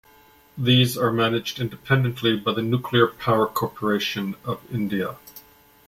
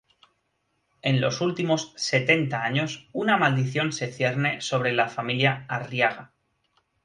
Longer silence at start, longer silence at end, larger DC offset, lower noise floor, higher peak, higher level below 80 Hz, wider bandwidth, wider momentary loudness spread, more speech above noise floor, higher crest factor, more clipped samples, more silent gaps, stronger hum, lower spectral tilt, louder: second, 0.55 s vs 1.05 s; second, 0.5 s vs 0.8 s; neither; second, -54 dBFS vs -74 dBFS; about the same, -4 dBFS vs -6 dBFS; first, -56 dBFS vs -66 dBFS; first, 16.5 kHz vs 10.5 kHz; first, 10 LU vs 7 LU; second, 31 dB vs 49 dB; about the same, 20 dB vs 20 dB; neither; neither; neither; about the same, -5.5 dB/octave vs -5 dB/octave; about the same, -23 LUFS vs -24 LUFS